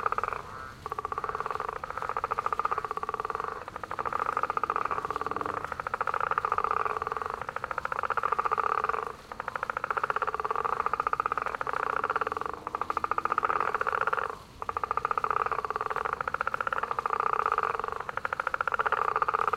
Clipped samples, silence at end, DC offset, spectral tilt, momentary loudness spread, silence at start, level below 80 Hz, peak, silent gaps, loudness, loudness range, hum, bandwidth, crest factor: under 0.1%; 0 s; under 0.1%; -4.5 dB/octave; 7 LU; 0 s; -56 dBFS; -8 dBFS; none; -31 LUFS; 2 LU; none; 15.5 kHz; 22 dB